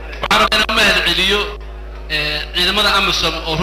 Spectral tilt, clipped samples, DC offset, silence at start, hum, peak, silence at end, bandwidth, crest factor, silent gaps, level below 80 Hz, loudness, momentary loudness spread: -2.5 dB/octave; under 0.1%; under 0.1%; 0 s; none; -4 dBFS; 0 s; 16 kHz; 12 dB; none; -30 dBFS; -13 LUFS; 12 LU